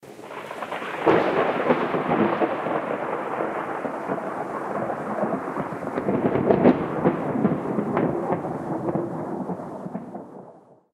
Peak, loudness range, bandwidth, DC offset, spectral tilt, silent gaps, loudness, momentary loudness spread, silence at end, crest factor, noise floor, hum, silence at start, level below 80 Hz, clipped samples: 0 dBFS; 5 LU; 13.5 kHz; under 0.1%; -8 dB/octave; none; -25 LUFS; 13 LU; 0.35 s; 24 dB; -49 dBFS; none; 0 s; -60 dBFS; under 0.1%